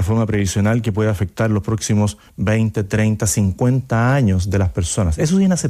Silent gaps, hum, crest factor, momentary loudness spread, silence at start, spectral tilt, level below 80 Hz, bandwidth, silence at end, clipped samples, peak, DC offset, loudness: none; none; 12 dB; 4 LU; 0 s; -6 dB/octave; -36 dBFS; 14.5 kHz; 0 s; under 0.1%; -6 dBFS; under 0.1%; -18 LUFS